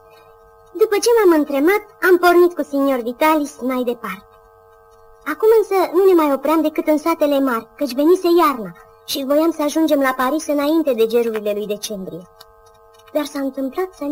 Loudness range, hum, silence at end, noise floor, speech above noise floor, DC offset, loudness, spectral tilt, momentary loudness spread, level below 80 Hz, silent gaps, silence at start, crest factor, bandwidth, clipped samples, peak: 5 LU; none; 0 s; -48 dBFS; 31 dB; under 0.1%; -17 LUFS; -4 dB/octave; 14 LU; -58 dBFS; none; 0.75 s; 14 dB; 16.5 kHz; under 0.1%; -4 dBFS